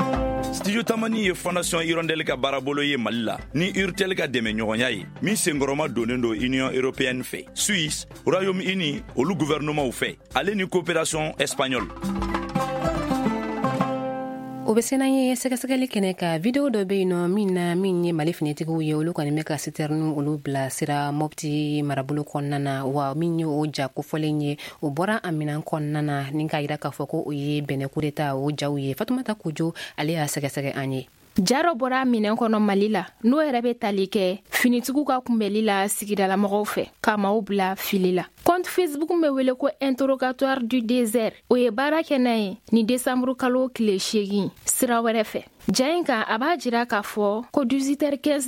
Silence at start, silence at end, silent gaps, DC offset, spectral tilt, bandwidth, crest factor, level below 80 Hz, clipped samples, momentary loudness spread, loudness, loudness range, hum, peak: 0 s; 0 s; none; under 0.1%; -5 dB/octave; 16.5 kHz; 22 dB; -48 dBFS; under 0.1%; 6 LU; -24 LUFS; 4 LU; none; -2 dBFS